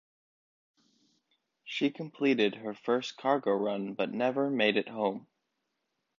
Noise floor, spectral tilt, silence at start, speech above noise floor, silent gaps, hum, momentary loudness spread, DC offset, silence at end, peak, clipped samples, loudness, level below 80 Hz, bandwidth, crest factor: -82 dBFS; -5.5 dB/octave; 1.65 s; 52 dB; none; none; 7 LU; under 0.1%; 0.95 s; -12 dBFS; under 0.1%; -31 LUFS; -82 dBFS; 7.4 kHz; 20 dB